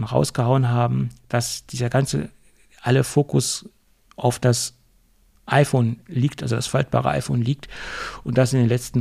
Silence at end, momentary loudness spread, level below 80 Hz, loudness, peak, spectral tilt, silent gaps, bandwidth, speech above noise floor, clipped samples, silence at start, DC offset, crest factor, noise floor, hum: 0 s; 10 LU; -48 dBFS; -22 LUFS; -4 dBFS; -5.5 dB/octave; none; 14.5 kHz; 37 dB; under 0.1%; 0 s; under 0.1%; 18 dB; -58 dBFS; none